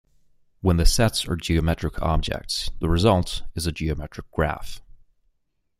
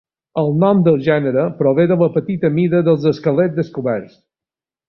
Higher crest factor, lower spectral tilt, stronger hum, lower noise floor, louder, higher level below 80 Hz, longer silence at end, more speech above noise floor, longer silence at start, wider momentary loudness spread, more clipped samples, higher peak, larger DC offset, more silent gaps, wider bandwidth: first, 20 dB vs 14 dB; second, -5 dB/octave vs -10 dB/octave; neither; second, -71 dBFS vs -89 dBFS; second, -24 LUFS vs -16 LUFS; first, -30 dBFS vs -56 dBFS; first, 1 s vs 0.85 s; second, 49 dB vs 74 dB; first, 0.65 s vs 0.35 s; first, 10 LU vs 7 LU; neither; about the same, -4 dBFS vs -2 dBFS; neither; neither; first, 15.5 kHz vs 6 kHz